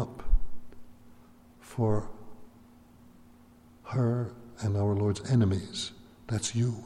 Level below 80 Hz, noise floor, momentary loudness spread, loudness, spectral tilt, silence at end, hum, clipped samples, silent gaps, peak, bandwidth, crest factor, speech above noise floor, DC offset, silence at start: -38 dBFS; -56 dBFS; 20 LU; -31 LUFS; -6 dB/octave; 0 s; none; under 0.1%; none; -14 dBFS; 11.5 kHz; 18 dB; 28 dB; under 0.1%; 0 s